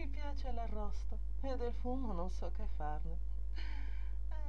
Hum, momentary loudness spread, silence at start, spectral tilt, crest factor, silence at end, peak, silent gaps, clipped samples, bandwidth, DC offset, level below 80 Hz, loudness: none; 4 LU; 0 s; -7.5 dB/octave; 12 dB; 0 s; -26 dBFS; none; under 0.1%; 6.6 kHz; 1%; -40 dBFS; -44 LUFS